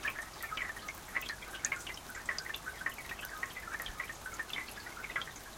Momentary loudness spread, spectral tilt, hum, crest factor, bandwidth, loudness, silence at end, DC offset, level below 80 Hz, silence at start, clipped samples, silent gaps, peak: 5 LU; -1 dB/octave; none; 28 dB; 17 kHz; -40 LUFS; 0 s; under 0.1%; -58 dBFS; 0 s; under 0.1%; none; -14 dBFS